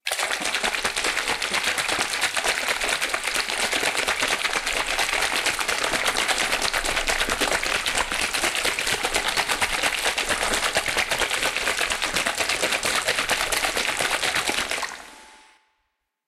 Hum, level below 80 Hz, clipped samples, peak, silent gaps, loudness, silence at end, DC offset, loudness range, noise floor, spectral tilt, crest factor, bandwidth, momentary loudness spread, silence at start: none; -44 dBFS; under 0.1%; -4 dBFS; none; -22 LUFS; 0.9 s; under 0.1%; 1 LU; -76 dBFS; 0 dB/octave; 20 dB; 16 kHz; 2 LU; 0.05 s